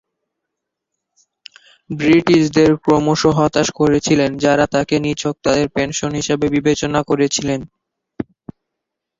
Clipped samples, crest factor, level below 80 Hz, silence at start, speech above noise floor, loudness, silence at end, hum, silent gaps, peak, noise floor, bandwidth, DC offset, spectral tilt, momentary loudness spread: under 0.1%; 16 dB; -46 dBFS; 1.9 s; 65 dB; -16 LUFS; 1 s; none; none; 0 dBFS; -80 dBFS; 7.8 kHz; under 0.1%; -5 dB/octave; 9 LU